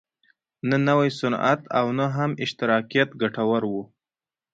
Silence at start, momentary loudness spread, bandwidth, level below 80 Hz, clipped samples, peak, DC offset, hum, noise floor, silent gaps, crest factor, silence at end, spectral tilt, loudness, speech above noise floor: 0.65 s; 6 LU; 8 kHz; -64 dBFS; under 0.1%; -6 dBFS; under 0.1%; none; under -90 dBFS; none; 18 dB; 0.7 s; -6.5 dB/octave; -23 LUFS; over 67 dB